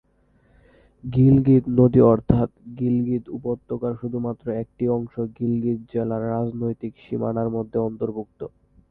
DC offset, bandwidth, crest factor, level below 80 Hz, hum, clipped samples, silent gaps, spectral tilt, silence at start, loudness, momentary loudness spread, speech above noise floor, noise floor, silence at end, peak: under 0.1%; 4 kHz; 22 dB; -46 dBFS; none; under 0.1%; none; -13 dB/octave; 1.05 s; -22 LUFS; 13 LU; 39 dB; -61 dBFS; 0.4 s; 0 dBFS